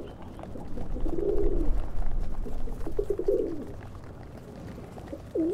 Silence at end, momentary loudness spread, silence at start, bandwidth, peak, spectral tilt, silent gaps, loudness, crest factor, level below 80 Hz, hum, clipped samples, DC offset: 0 s; 15 LU; 0 s; 3.8 kHz; -12 dBFS; -8.5 dB/octave; none; -34 LUFS; 16 dB; -32 dBFS; none; under 0.1%; under 0.1%